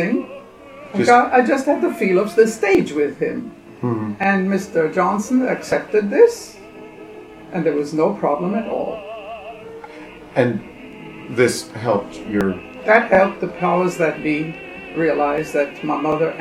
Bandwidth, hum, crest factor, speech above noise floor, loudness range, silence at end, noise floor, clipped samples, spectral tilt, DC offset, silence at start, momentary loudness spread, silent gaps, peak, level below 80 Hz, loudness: 15 kHz; none; 18 dB; 21 dB; 6 LU; 0 s; -39 dBFS; under 0.1%; -6 dB/octave; under 0.1%; 0 s; 21 LU; none; 0 dBFS; -54 dBFS; -18 LUFS